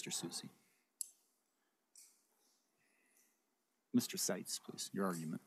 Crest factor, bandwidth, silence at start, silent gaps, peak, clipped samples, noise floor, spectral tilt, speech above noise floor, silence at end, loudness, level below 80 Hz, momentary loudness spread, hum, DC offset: 24 dB; 15.5 kHz; 0 s; none; -22 dBFS; under 0.1%; -84 dBFS; -3.5 dB/octave; 42 dB; 0.1 s; -42 LUFS; under -90 dBFS; 10 LU; none; under 0.1%